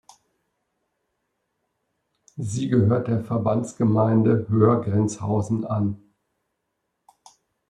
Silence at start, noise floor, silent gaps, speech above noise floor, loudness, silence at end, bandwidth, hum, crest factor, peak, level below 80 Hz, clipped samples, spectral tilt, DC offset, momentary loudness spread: 2.35 s; -78 dBFS; none; 57 dB; -22 LUFS; 1.75 s; 10.5 kHz; none; 18 dB; -6 dBFS; -62 dBFS; under 0.1%; -8.5 dB/octave; under 0.1%; 10 LU